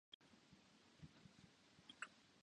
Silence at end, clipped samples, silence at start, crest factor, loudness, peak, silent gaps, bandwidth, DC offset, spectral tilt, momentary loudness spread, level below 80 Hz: 0 s; under 0.1%; 0.1 s; 28 dB; -62 LUFS; -36 dBFS; 0.14-0.20 s; 10 kHz; under 0.1%; -3 dB/octave; 13 LU; -84 dBFS